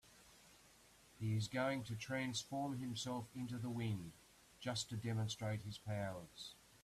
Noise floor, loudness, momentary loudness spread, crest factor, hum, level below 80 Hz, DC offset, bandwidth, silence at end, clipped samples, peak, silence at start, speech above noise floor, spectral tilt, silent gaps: -67 dBFS; -44 LUFS; 22 LU; 16 dB; none; -72 dBFS; under 0.1%; 14.5 kHz; 0.05 s; under 0.1%; -28 dBFS; 0.05 s; 24 dB; -5 dB/octave; none